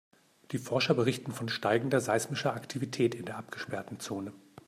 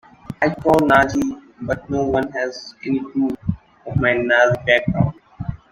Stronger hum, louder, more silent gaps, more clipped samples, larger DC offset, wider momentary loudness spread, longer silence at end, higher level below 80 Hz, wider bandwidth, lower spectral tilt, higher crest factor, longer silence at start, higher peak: neither; second, -32 LUFS vs -19 LUFS; neither; neither; neither; second, 12 LU vs 16 LU; first, 0.3 s vs 0.15 s; second, -74 dBFS vs -42 dBFS; about the same, 15.5 kHz vs 16 kHz; second, -5 dB/octave vs -6.5 dB/octave; about the same, 20 dB vs 18 dB; first, 0.5 s vs 0.3 s; second, -12 dBFS vs 0 dBFS